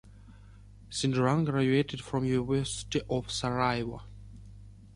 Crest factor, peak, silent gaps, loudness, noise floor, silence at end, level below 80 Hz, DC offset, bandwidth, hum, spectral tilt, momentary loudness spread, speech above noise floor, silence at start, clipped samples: 20 dB; -12 dBFS; none; -30 LUFS; -52 dBFS; 0.05 s; -52 dBFS; under 0.1%; 11.5 kHz; none; -5.5 dB/octave; 20 LU; 22 dB; 0.05 s; under 0.1%